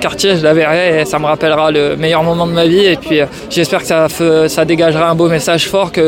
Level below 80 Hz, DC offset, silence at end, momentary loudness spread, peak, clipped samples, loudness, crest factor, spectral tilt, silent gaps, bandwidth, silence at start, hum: -42 dBFS; under 0.1%; 0 s; 4 LU; 0 dBFS; under 0.1%; -11 LUFS; 10 dB; -5 dB/octave; none; 17 kHz; 0 s; none